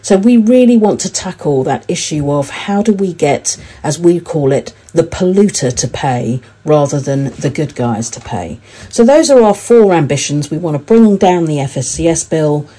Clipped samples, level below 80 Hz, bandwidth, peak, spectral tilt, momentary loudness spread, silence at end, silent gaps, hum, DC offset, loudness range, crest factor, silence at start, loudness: 1%; -42 dBFS; 11 kHz; 0 dBFS; -5.5 dB/octave; 10 LU; 0.15 s; none; none; under 0.1%; 5 LU; 12 dB; 0.05 s; -12 LUFS